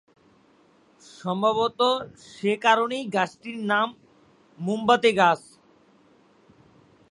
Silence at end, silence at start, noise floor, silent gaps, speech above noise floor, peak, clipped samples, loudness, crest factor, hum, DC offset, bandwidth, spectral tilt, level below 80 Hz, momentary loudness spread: 1.75 s; 1.2 s; -59 dBFS; none; 36 dB; -4 dBFS; under 0.1%; -23 LUFS; 22 dB; none; under 0.1%; 11.5 kHz; -4.5 dB/octave; -68 dBFS; 11 LU